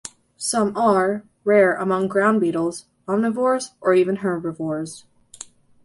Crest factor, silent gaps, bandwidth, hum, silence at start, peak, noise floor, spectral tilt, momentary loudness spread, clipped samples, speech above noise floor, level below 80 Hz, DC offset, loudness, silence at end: 18 dB; none; 12 kHz; none; 0.05 s; -4 dBFS; -43 dBFS; -5 dB/octave; 20 LU; under 0.1%; 23 dB; -64 dBFS; under 0.1%; -20 LUFS; 0.4 s